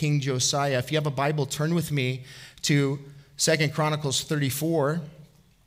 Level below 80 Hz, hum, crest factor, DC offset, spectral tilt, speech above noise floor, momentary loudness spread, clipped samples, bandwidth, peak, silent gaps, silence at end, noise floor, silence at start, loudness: -60 dBFS; none; 18 dB; under 0.1%; -4.5 dB/octave; 27 dB; 10 LU; under 0.1%; 16 kHz; -8 dBFS; none; 0.4 s; -53 dBFS; 0 s; -25 LUFS